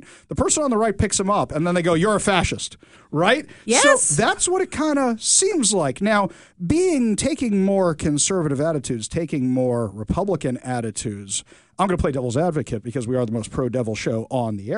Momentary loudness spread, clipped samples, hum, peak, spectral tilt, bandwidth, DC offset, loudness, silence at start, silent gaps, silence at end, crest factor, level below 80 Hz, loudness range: 10 LU; under 0.1%; none; 0 dBFS; -4 dB/octave; 11 kHz; 0.1%; -20 LUFS; 0.1 s; none; 0 s; 20 dB; -42 dBFS; 6 LU